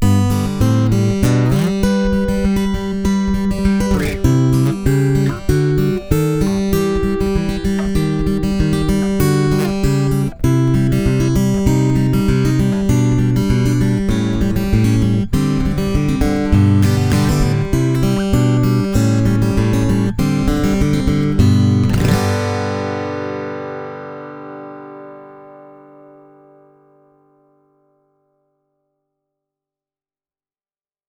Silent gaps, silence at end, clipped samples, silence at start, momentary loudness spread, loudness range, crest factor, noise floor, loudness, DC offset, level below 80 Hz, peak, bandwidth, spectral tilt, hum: none; 5.45 s; under 0.1%; 0 s; 6 LU; 5 LU; 16 dB; under -90 dBFS; -16 LUFS; under 0.1%; -26 dBFS; 0 dBFS; over 20 kHz; -7 dB/octave; none